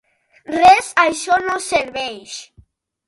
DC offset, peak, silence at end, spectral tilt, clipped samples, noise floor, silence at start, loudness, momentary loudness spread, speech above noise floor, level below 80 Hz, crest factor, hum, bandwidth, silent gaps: under 0.1%; 0 dBFS; 0.65 s; -2 dB/octave; under 0.1%; -52 dBFS; 0.5 s; -16 LUFS; 19 LU; 36 dB; -52 dBFS; 18 dB; none; 11.5 kHz; none